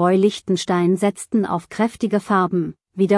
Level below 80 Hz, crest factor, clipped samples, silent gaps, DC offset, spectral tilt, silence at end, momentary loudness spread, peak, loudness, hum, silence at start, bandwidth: -60 dBFS; 14 dB; under 0.1%; none; under 0.1%; -6.5 dB/octave; 0 s; 6 LU; -6 dBFS; -20 LUFS; none; 0 s; 12 kHz